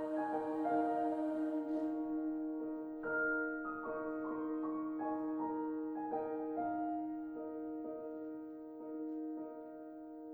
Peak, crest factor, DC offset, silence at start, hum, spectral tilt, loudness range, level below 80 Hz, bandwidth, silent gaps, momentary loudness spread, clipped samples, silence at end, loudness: -26 dBFS; 14 dB; under 0.1%; 0 s; none; -8 dB/octave; 5 LU; -76 dBFS; 3.3 kHz; none; 11 LU; under 0.1%; 0 s; -40 LUFS